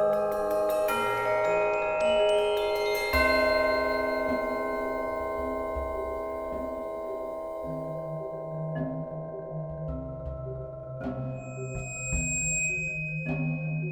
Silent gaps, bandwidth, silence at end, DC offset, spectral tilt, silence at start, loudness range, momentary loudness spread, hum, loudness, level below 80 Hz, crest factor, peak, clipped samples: none; over 20 kHz; 0 s; under 0.1%; -4 dB/octave; 0 s; 10 LU; 12 LU; none; -29 LUFS; -46 dBFS; 16 dB; -12 dBFS; under 0.1%